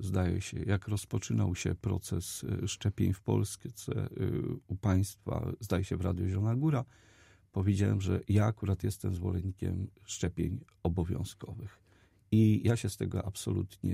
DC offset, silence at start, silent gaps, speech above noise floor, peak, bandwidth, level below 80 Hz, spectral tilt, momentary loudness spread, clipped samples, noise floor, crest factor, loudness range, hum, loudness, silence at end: under 0.1%; 0 s; none; 33 dB; -14 dBFS; 14.5 kHz; -52 dBFS; -6.5 dB/octave; 9 LU; under 0.1%; -65 dBFS; 18 dB; 3 LU; none; -33 LUFS; 0 s